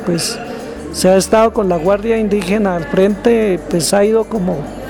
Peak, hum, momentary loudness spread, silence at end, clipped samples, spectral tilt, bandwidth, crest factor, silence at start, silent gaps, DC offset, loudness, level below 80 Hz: -2 dBFS; none; 8 LU; 0 s; under 0.1%; -5 dB/octave; 18.5 kHz; 12 dB; 0 s; none; under 0.1%; -14 LUFS; -36 dBFS